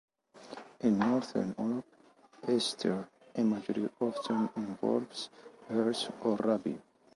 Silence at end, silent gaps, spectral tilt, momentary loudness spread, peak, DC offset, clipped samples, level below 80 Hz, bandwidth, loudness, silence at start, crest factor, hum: 0.35 s; none; -5.5 dB/octave; 12 LU; -16 dBFS; under 0.1%; under 0.1%; -74 dBFS; 11.5 kHz; -33 LUFS; 0.35 s; 18 dB; none